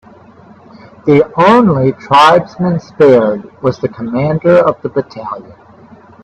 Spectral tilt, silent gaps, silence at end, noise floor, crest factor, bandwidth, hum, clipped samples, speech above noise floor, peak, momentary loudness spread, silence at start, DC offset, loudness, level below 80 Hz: -7 dB/octave; none; 0.8 s; -39 dBFS; 12 dB; 10.5 kHz; none; under 0.1%; 29 dB; 0 dBFS; 12 LU; 1.05 s; under 0.1%; -11 LUFS; -48 dBFS